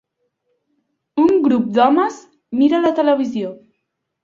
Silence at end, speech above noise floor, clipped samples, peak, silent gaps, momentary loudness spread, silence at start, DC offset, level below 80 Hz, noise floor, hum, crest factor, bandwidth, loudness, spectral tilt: 0.7 s; 59 dB; under 0.1%; -2 dBFS; none; 12 LU; 1.15 s; under 0.1%; -62 dBFS; -74 dBFS; none; 16 dB; 7.6 kHz; -16 LUFS; -6.5 dB/octave